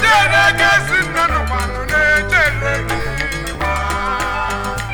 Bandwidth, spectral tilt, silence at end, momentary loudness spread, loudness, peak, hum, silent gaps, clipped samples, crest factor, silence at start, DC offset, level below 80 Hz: over 20 kHz; -3.5 dB/octave; 0 s; 10 LU; -15 LUFS; -2 dBFS; none; none; under 0.1%; 14 dB; 0 s; under 0.1%; -26 dBFS